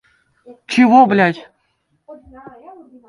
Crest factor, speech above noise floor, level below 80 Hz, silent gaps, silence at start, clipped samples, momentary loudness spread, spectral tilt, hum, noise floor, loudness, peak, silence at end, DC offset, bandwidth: 18 dB; 53 dB; -60 dBFS; none; 0.7 s; under 0.1%; 12 LU; -6 dB/octave; none; -65 dBFS; -13 LUFS; 0 dBFS; 0.95 s; under 0.1%; 11 kHz